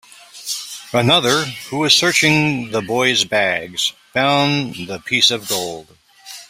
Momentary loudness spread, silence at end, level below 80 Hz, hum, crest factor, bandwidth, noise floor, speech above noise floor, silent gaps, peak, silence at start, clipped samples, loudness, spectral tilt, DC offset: 13 LU; 0.05 s; -56 dBFS; none; 18 dB; 16 kHz; -39 dBFS; 22 dB; none; 0 dBFS; 0.35 s; under 0.1%; -16 LUFS; -3 dB/octave; under 0.1%